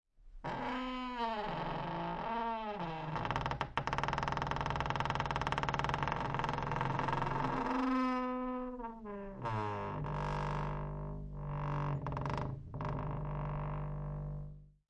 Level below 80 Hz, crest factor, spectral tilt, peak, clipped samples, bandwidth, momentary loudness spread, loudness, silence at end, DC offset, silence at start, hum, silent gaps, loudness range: -50 dBFS; 24 dB; -6.5 dB/octave; -14 dBFS; under 0.1%; 8.6 kHz; 8 LU; -38 LUFS; 0.2 s; under 0.1%; 0.2 s; none; none; 4 LU